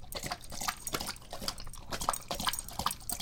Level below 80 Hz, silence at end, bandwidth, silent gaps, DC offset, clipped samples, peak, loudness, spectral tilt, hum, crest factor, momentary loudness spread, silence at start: -48 dBFS; 0 s; 17 kHz; none; under 0.1%; under 0.1%; -12 dBFS; -36 LUFS; -1.5 dB/octave; none; 26 dB; 6 LU; 0 s